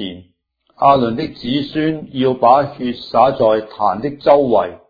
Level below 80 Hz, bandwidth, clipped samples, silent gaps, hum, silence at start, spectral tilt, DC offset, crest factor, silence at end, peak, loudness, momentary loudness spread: -50 dBFS; 5 kHz; under 0.1%; none; none; 0 s; -8.5 dB/octave; under 0.1%; 16 dB; 0.15 s; 0 dBFS; -15 LUFS; 8 LU